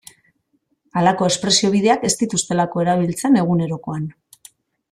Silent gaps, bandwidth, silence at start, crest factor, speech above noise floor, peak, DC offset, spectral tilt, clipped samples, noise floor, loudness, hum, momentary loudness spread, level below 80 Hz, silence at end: none; 14 kHz; 0.95 s; 18 dB; 49 dB; -2 dBFS; under 0.1%; -4.5 dB/octave; under 0.1%; -67 dBFS; -18 LUFS; none; 11 LU; -56 dBFS; 0.8 s